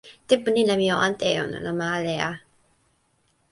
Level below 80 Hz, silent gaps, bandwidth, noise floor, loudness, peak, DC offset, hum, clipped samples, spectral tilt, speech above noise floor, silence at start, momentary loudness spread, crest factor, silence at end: -60 dBFS; none; 11.5 kHz; -67 dBFS; -23 LUFS; -4 dBFS; under 0.1%; none; under 0.1%; -4.5 dB/octave; 44 dB; 0.05 s; 8 LU; 20 dB; 1.15 s